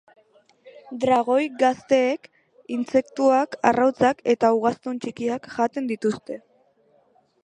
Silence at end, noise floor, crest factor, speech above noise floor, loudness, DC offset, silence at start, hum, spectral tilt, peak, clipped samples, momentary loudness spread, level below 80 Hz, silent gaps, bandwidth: 1.05 s; -61 dBFS; 20 dB; 40 dB; -22 LUFS; under 0.1%; 0.65 s; none; -5.5 dB/octave; -2 dBFS; under 0.1%; 12 LU; -64 dBFS; none; 10 kHz